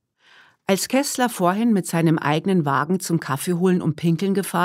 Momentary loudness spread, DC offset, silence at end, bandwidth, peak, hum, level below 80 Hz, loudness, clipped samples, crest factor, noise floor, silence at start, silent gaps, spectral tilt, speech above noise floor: 4 LU; under 0.1%; 0 s; 16 kHz; -4 dBFS; none; -68 dBFS; -21 LUFS; under 0.1%; 16 dB; -54 dBFS; 0.7 s; none; -5.5 dB/octave; 34 dB